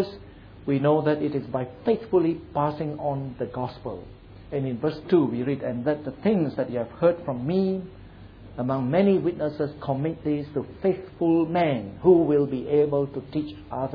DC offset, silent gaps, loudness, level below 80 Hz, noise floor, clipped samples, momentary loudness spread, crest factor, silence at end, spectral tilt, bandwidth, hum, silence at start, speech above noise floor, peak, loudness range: under 0.1%; none; -25 LUFS; -52 dBFS; -45 dBFS; under 0.1%; 11 LU; 20 dB; 0 s; -10.5 dB/octave; 5.2 kHz; none; 0 s; 21 dB; -6 dBFS; 4 LU